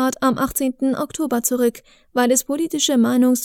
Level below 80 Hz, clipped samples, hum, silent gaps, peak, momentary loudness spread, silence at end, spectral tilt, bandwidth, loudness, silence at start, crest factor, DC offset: -52 dBFS; under 0.1%; none; none; -4 dBFS; 6 LU; 0 s; -3 dB/octave; 20 kHz; -19 LUFS; 0 s; 14 dB; under 0.1%